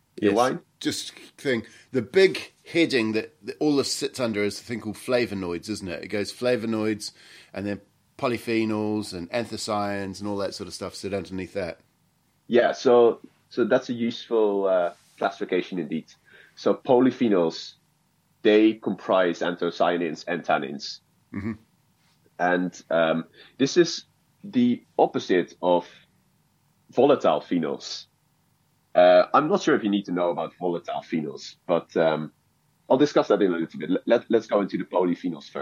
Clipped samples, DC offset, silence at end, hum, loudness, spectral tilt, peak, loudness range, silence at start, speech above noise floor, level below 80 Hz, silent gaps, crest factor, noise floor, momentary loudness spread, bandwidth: under 0.1%; under 0.1%; 0 s; none; -24 LUFS; -5 dB/octave; -6 dBFS; 6 LU; 0.15 s; 43 dB; -68 dBFS; none; 20 dB; -67 dBFS; 13 LU; 16 kHz